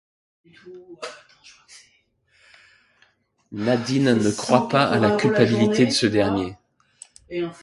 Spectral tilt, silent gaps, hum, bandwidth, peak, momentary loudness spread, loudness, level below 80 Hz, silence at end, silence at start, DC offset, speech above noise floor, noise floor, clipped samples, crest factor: -5.5 dB/octave; none; none; 11.5 kHz; 0 dBFS; 19 LU; -20 LUFS; -56 dBFS; 0.1 s; 0.65 s; under 0.1%; 42 dB; -63 dBFS; under 0.1%; 22 dB